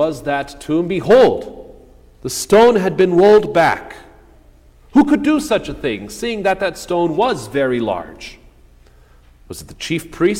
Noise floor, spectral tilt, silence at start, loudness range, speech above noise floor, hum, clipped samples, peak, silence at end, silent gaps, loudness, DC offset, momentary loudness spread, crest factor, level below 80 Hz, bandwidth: -47 dBFS; -5 dB/octave; 0 s; 8 LU; 31 dB; none; under 0.1%; -2 dBFS; 0 s; none; -16 LUFS; under 0.1%; 20 LU; 14 dB; -44 dBFS; 16.5 kHz